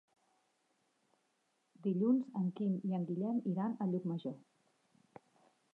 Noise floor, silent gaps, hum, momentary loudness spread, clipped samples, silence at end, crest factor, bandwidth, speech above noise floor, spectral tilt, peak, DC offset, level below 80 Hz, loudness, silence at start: -80 dBFS; none; none; 9 LU; under 0.1%; 1.35 s; 16 dB; 4.2 kHz; 44 dB; -10.5 dB/octave; -22 dBFS; under 0.1%; under -90 dBFS; -37 LUFS; 1.85 s